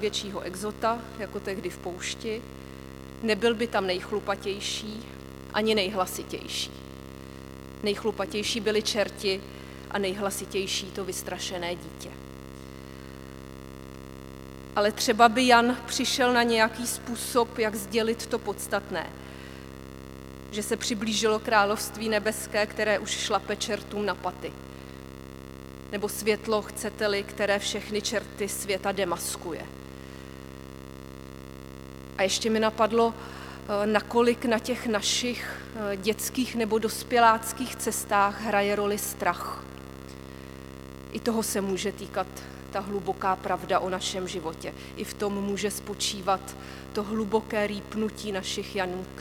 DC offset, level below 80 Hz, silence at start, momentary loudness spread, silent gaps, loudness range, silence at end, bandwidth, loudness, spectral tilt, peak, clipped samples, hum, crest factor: under 0.1%; -50 dBFS; 0 s; 19 LU; none; 8 LU; 0 s; 19 kHz; -28 LUFS; -3 dB/octave; -2 dBFS; under 0.1%; 50 Hz at -50 dBFS; 26 dB